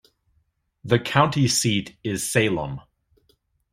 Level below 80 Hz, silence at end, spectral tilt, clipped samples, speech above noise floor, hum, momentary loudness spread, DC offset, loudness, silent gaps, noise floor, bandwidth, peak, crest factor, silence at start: -54 dBFS; 0.9 s; -4 dB/octave; under 0.1%; 47 dB; none; 14 LU; under 0.1%; -22 LUFS; none; -69 dBFS; 15.5 kHz; -2 dBFS; 22 dB; 0.85 s